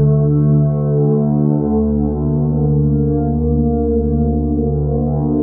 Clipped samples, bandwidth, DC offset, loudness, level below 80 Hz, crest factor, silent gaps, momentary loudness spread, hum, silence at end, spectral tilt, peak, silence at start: under 0.1%; 1.6 kHz; under 0.1%; -15 LUFS; -26 dBFS; 10 dB; none; 4 LU; none; 0 s; -18.5 dB/octave; -4 dBFS; 0 s